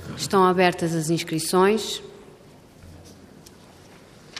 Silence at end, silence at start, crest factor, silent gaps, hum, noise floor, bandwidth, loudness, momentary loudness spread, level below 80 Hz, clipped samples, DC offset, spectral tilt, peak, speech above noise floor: 0 s; 0 s; 20 dB; none; none; -49 dBFS; 15.5 kHz; -22 LUFS; 12 LU; -60 dBFS; under 0.1%; under 0.1%; -4.5 dB/octave; -6 dBFS; 28 dB